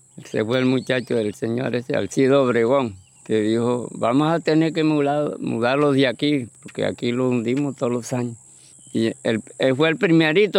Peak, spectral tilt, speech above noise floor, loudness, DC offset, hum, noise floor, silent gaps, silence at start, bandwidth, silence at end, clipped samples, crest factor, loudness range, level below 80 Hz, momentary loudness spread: -4 dBFS; -6 dB/octave; 27 dB; -21 LUFS; under 0.1%; none; -47 dBFS; none; 0.15 s; 12.5 kHz; 0 s; under 0.1%; 16 dB; 4 LU; -68 dBFS; 9 LU